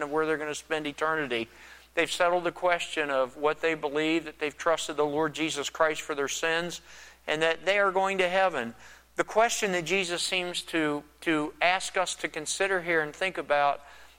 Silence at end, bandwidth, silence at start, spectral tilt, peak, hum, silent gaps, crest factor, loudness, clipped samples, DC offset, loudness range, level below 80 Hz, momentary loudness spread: 0.1 s; 16.5 kHz; 0 s; -2.5 dB/octave; -8 dBFS; none; none; 20 dB; -28 LUFS; under 0.1%; under 0.1%; 2 LU; -62 dBFS; 8 LU